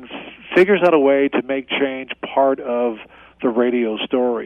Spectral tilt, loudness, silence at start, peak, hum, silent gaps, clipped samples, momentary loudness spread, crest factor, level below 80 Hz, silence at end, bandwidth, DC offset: -7 dB/octave; -18 LUFS; 0 s; -2 dBFS; none; none; under 0.1%; 11 LU; 16 dB; -60 dBFS; 0 s; 5.8 kHz; under 0.1%